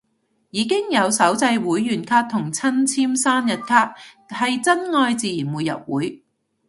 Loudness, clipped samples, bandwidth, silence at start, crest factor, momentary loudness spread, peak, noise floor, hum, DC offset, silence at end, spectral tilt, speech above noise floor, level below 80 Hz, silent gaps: -20 LUFS; under 0.1%; 12 kHz; 0.55 s; 20 dB; 8 LU; 0 dBFS; -68 dBFS; none; under 0.1%; 0.5 s; -3.5 dB/octave; 48 dB; -66 dBFS; none